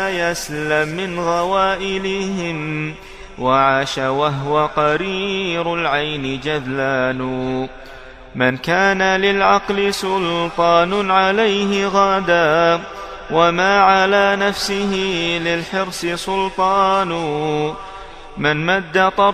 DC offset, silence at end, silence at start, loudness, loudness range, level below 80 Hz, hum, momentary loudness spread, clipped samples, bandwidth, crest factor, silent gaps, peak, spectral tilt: under 0.1%; 0 s; 0 s; -17 LUFS; 5 LU; -44 dBFS; none; 9 LU; under 0.1%; 14.5 kHz; 18 dB; none; 0 dBFS; -4.5 dB/octave